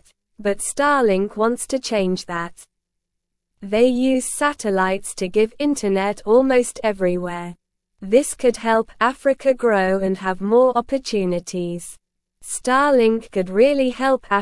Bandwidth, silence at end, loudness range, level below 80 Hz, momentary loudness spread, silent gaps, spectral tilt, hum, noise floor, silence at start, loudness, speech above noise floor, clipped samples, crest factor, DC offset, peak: 12 kHz; 0 s; 3 LU; -50 dBFS; 11 LU; none; -4.5 dB/octave; none; -78 dBFS; 0.4 s; -19 LUFS; 59 dB; under 0.1%; 18 dB; under 0.1%; -2 dBFS